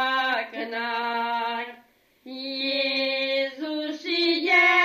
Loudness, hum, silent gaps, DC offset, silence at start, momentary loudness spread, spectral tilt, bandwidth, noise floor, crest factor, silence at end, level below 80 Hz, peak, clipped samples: -24 LUFS; none; none; under 0.1%; 0 s; 13 LU; -2 dB/octave; 15 kHz; -58 dBFS; 18 dB; 0 s; -80 dBFS; -8 dBFS; under 0.1%